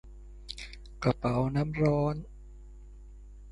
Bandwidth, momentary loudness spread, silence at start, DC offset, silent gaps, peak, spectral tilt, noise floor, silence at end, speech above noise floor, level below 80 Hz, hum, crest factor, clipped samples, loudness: 11.5 kHz; 25 LU; 0.05 s; under 0.1%; none; -12 dBFS; -8 dB/octave; -48 dBFS; 0 s; 20 dB; -46 dBFS; 50 Hz at -45 dBFS; 20 dB; under 0.1%; -30 LUFS